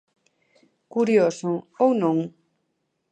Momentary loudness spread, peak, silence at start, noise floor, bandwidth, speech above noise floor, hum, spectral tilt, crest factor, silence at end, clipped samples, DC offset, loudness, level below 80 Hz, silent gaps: 10 LU; -6 dBFS; 0.95 s; -75 dBFS; 9.4 kHz; 54 dB; none; -7 dB/octave; 18 dB; 0.8 s; under 0.1%; under 0.1%; -22 LUFS; -76 dBFS; none